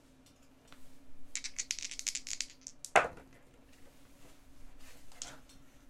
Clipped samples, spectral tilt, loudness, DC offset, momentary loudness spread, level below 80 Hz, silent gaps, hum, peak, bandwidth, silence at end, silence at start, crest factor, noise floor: under 0.1%; -0.5 dB/octave; -36 LUFS; under 0.1%; 27 LU; -62 dBFS; none; none; -10 dBFS; 16 kHz; 0 s; 0.05 s; 30 dB; -61 dBFS